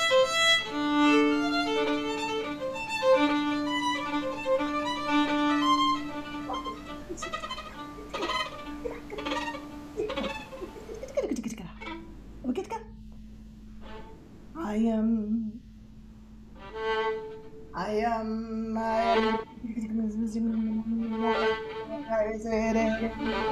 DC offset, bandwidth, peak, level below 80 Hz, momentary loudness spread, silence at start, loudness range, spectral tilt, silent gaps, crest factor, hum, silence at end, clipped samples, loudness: under 0.1%; 14 kHz; -12 dBFS; -50 dBFS; 18 LU; 0 s; 9 LU; -4 dB/octave; none; 18 dB; none; 0 s; under 0.1%; -29 LUFS